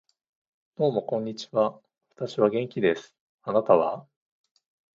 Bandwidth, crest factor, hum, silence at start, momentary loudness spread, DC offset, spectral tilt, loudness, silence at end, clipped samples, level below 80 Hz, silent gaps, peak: 7.6 kHz; 22 dB; none; 0.8 s; 12 LU; under 0.1%; -6.5 dB/octave; -26 LUFS; 0.95 s; under 0.1%; -70 dBFS; 3.20-3.38 s; -6 dBFS